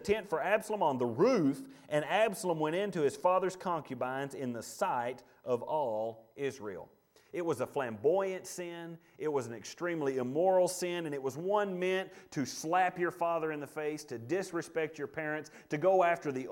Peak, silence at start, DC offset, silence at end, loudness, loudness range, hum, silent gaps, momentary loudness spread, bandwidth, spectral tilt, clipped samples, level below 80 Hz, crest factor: -14 dBFS; 0 s; under 0.1%; 0 s; -33 LUFS; 5 LU; none; none; 12 LU; 17 kHz; -5 dB/octave; under 0.1%; -72 dBFS; 18 dB